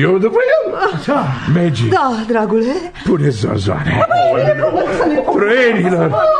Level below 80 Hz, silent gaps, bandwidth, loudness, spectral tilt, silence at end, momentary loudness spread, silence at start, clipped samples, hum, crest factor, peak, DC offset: -42 dBFS; none; 10 kHz; -14 LUFS; -7 dB/octave; 0 s; 5 LU; 0 s; under 0.1%; none; 12 dB; -2 dBFS; 0.3%